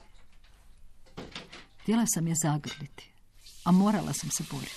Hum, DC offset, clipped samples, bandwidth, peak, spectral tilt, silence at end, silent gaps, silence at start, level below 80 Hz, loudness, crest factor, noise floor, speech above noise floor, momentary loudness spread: none; under 0.1%; under 0.1%; 14 kHz; -14 dBFS; -5 dB/octave; 0 s; none; 0.1 s; -56 dBFS; -28 LUFS; 16 dB; -53 dBFS; 25 dB; 21 LU